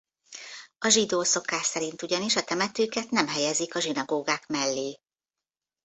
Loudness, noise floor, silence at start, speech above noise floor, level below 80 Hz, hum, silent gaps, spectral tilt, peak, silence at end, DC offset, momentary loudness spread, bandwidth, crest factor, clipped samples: -26 LUFS; under -90 dBFS; 0.3 s; over 63 dB; -72 dBFS; none; none; -1.5 dB/octave; -6 dBFS; 0.9 s; under 0.1%; 15 LU; 8.4 kHz; 24 dB; under 0.1%